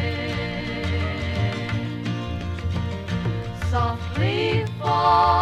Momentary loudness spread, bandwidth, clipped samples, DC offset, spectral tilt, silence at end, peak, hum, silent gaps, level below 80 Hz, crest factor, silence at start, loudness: 8 LU; 10.5 kHz; under 0.1%; under 0.1%; -6.5 dB/octave; 0 s; -6 dBFS; none; none; -38 dBFS; 18 dB; 0 s; -24 LUFS